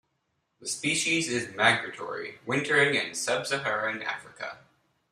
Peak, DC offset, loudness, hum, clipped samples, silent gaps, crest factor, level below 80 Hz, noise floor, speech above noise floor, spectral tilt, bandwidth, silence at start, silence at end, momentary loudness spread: -8 dBFS; under 0.1%; -27 LUFS; none; under 0.1%; none; 22 dB; -72 dBFS; -77 dBFS; 48 dB; -2.5 dB/octave; 15 kHz; 0.6 s; 0.55 s; 14 LU